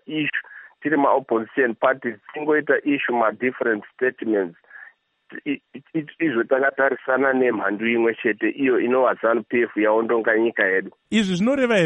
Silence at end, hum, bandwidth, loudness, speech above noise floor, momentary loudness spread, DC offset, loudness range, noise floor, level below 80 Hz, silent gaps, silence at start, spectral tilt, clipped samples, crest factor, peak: 0 s; none; 9.8 kHz; -21 LUFS; 28 dB; 10 LU; under 0.1%; 5 LU; -49 dBFS; -68 dBFS; none; 0.1 s; -6 dB/octave; under 0.1%; 18 dB; -4 dBFS